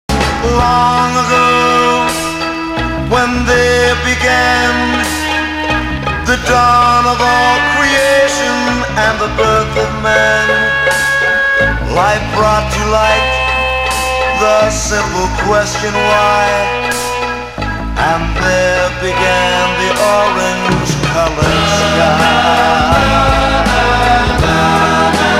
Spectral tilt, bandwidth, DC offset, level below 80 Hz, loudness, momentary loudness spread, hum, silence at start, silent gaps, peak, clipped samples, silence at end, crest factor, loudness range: -4 dB/octave; 16.5 kHz; under 0.1%; -24 dBFS; -11 LUFS; 5 LU; none; 0.1 s; none; 0 dBFS; under 0.1%; 0 s; 12 dB; 3 LU